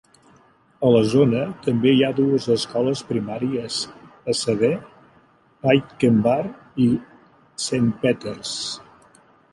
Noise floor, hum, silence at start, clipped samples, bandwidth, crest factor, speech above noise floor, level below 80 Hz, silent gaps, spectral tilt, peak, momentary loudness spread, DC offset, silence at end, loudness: -56 dBFS; none; 0.8 s; under 0.1%; 11.5 kHz; 18 dB; 36 dB; -58 dBFS; none; -5.5 dB/octave; -2 dBFS; 11 LU; under 0.1%; 0.7 s; -21 LUFS